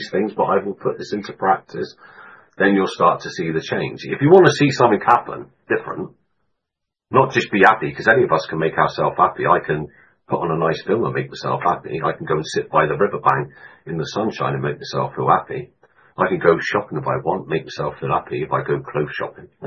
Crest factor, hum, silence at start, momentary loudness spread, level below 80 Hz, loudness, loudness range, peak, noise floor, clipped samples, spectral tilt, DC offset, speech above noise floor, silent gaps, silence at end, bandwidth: 20 dB; none; 0 s; 13 LU; -56 dBFS; -19 LUFS; 5 LU; 0 dBFS; -82 dBFS; under 0.1%; -6 dB/octave; under 0.1%; 63 dB; none; 0 s; 9.2 kHz